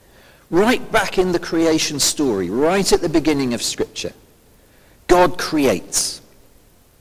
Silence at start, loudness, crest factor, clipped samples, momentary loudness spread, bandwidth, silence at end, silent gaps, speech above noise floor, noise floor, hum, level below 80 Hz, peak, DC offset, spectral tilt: 0.5 s; -18 LUFS; 20 dB; under 0.1%; 9 LU; 16 kHz; 0.85 s; none; 34 dB; -52 dBFS; none; -42 dBFS; 0 dBFS; under 0.1%; -3.5 dB/octave